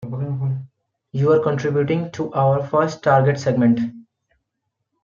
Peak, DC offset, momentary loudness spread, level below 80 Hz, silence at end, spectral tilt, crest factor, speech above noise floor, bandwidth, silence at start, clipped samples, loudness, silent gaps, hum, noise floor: -2 dBFS; under 0.1%; 10 LU; -62 dBFS; 1 s; -8 dB/octave; 18 dB; 60 dB; 7.4 kHz; 0 s; under 0.1%; -19 LUFS; none; none; -77 dBFS